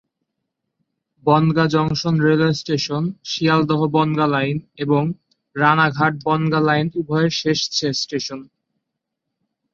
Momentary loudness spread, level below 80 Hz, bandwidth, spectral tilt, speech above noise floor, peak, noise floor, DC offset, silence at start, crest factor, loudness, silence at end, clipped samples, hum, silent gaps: 9 LU; -56 dBFS; 7.4 kHz; -5.5 dB/octave; 61 dB; -2 dBFS; -79 dBFS; under 0.1%; 1.25 s; 18 dB; -19 LUFS; 1.3 s; under 0.1%; none; none